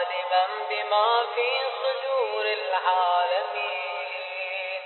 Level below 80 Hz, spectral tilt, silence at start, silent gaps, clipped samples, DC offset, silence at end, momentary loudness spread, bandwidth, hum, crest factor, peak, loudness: under -90 dBFS; -1 dB/octave; 0 s; none; under 0.1%; under 0.1%; 0 s; 8 LU; 4.3 kHz; none; 16 dB; -10 dBFS; -25 LUFS